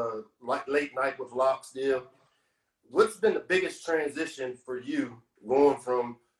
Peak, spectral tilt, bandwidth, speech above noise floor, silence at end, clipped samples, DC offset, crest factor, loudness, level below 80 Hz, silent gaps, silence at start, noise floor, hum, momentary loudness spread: -10 dBFS; -4.5 dB/octave; 12.5 kHz; 47 dB; 0.25 s; under 0.1%; under 0.1%; 20 dB; -29 LUFS; -70 dBFS; none; 0 s; -75 dBFS; none; 11 LU